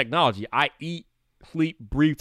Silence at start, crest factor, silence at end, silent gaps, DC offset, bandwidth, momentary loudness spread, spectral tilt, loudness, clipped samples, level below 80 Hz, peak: 0 s; 18 dB; 0.05 s; none; under 0.1%; 10 kHz; 13 LU; -6.5 dB/octave; -25 LUFS; under 0.1%; -46 dBFS; -6 dBFS